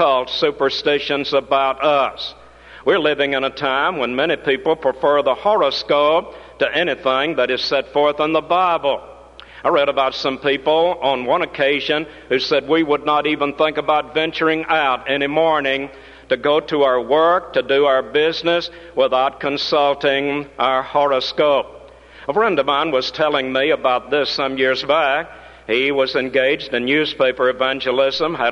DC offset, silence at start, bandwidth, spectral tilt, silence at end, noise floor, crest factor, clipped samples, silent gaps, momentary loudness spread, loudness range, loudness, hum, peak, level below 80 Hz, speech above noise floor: under 0.1%; 0 s; 9.4 kHz; -5 dB/octave; 0 s; -41 dBFS; 14 dB; under 0.1%; none; 5 LU; 1 LU; -18 LUFS; none; -4 dBFS; -52 dBFS; 24 dB